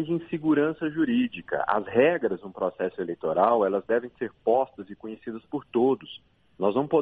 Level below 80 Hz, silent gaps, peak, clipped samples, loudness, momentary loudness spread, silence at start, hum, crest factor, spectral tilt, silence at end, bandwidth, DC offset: -66 dBFS; none; -6 dBFS; under 0.1%; -26 LUFS; 14 LU; 0 s; none; 20 dB; -9 dB/octave; 0 s; 4.6 kHz; under 0.1%